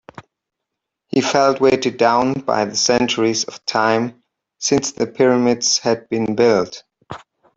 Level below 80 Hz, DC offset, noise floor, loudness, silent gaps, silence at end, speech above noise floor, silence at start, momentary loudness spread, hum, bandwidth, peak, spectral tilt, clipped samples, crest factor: -56 dBFS; under 0.1%; -80 dBFS; -17 LUFS; none; 0.4 s; 64 dB; 1.15 s; 12 LU; none; 8 kHz; -2 dBFS; -3.5 dB/octave; under 0.1%; 16 dB